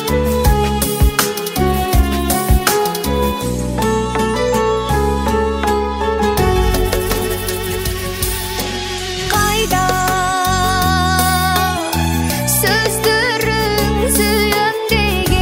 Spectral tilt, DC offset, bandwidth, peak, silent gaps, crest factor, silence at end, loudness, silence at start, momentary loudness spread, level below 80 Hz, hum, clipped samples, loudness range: -4 dB/octave; under 0.1%; 16.5 kHz; 0 dBFS; none; 16 dB; 0 s; -15 LUFS; 0 s; 6 LU; -22 dBFS; none; under 0.1%; 3 LU